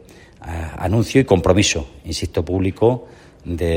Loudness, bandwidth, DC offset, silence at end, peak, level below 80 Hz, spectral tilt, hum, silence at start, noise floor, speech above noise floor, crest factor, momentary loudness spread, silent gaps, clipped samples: -19 LUFS; 16.5 kHz; under 0.1%; 0 s; -2 dBFS; -38 dBFS; -5 dB/octave; none; 0.4 s; -38 dBFS; 20 dB; 18 dB; 15 LU; none; under 0.1%